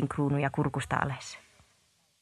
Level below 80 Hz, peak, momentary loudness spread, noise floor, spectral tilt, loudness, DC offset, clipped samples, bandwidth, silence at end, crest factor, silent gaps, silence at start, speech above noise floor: -56 dBFS; -10 dBFS; 14 LU; -69 dBFS; -6.5 dB/octave; -31 LUFS; under 0.1%; under 0.1%; 12 kHz; 0.8 s; 22 dB; none; 0 s; 39 dB